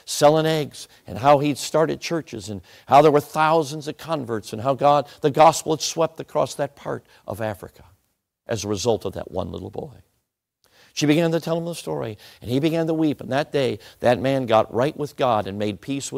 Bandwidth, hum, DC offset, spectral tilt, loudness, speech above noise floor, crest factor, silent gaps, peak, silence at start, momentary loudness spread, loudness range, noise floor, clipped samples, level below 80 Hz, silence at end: 16 kHz; none; under 0.1%; -5 dB/octave; -21 LUFS; 54 dB; 18 dB; none; -4 dBFS; 0.05 s; 16 LU; 9 LU; -75 dBFS; under 0.1%; -58 dBFS; 0 s